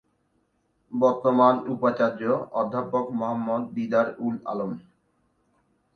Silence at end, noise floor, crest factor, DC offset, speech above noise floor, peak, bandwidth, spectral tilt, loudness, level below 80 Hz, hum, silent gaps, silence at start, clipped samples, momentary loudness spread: 1.15 s; -70 dBFS; 20 dB; under 0.1%; 46 dB; -6 dBFS; 6.4 kHz; -8 dB/octave; -25 LUFS; -70 dBFS; none; none; 0.9 s; under 0.1%; 11 LU